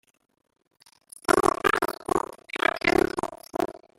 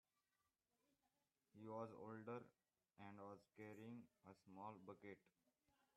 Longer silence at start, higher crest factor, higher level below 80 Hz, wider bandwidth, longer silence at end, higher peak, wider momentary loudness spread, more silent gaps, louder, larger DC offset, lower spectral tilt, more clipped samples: second, 1.3 s vs 1.55 s; about the same, 24 dB vs 22 dB; first, -52 dBFS vs under -90 dBFS; first, 16 kHz vs 10 kHz; second, 0.2 s vs 0.7 s; first, -4 dBFS vs -40 dBFS; about the same, 11 LU vs 10 LU; neither; first, -26 LUFS vs -59 LUFS; neither; second, -3.5 dB/octave vs -7.5 dB/octave; neither